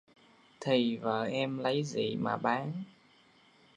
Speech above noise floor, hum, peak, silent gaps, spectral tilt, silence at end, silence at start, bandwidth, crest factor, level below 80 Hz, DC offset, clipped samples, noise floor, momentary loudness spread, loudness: 32 dB; none; -14 dBFS; none; -6 dB/octave; 0.85 s; 0.6 s; 10 kHz; 20 dB; -78 dBFS; under 0.1%; under 0.1%; -63 dBFS; 11 LU; -32 LUFS